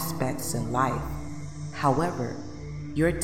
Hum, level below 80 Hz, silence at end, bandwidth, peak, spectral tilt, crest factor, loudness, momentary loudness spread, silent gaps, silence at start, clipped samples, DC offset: none; -44 dBFS; 0 s; 17 kHz; -10 dBFS; -5.5 dB/octave; 18 dB; -29 LUFS; 13 LU; none; 0 s; under 0.1%; 0.8%